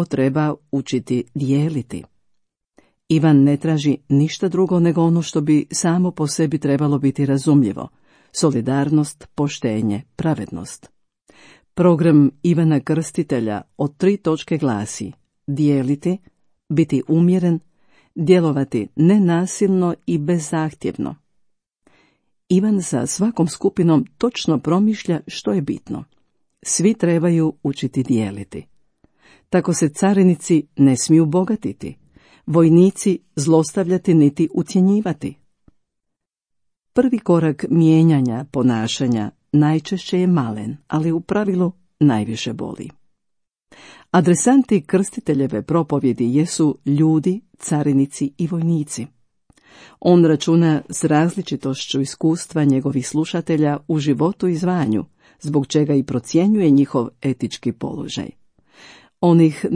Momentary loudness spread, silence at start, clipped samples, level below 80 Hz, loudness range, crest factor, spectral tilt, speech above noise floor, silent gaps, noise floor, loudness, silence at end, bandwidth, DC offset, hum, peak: 12 LU; 0 s; under 0.1%; -58 dBFS; 4 LU; 16 dB; -6.5 dB/octave; 62 dB; none; -80 dBFS; -18 LUFS; 0 s; 10.5 kHz; under 0.1%; none; -2 dBFS